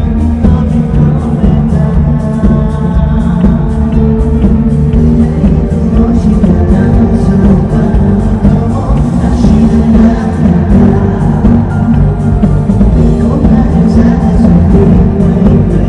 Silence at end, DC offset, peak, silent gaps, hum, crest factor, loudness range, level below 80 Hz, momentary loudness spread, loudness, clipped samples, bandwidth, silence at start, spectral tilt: 0 s; under 0.1%; 0 dBFS; none; none; 6 dB; 2 LU; -14 dBFS; 4 LU; -8 LUFS; 5%; 9.8 kHz; 0 s; -10 dB/octave